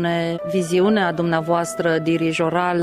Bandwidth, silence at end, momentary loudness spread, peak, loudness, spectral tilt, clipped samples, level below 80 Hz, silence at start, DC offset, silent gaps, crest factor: 14.5 kHz; 0 s; 4 LU; -6 dBFS; -20 LUFS; -5.5 dB/octave; under 0.1%; -58 dBFS; 0 s; under 0.1%; none; 14 dB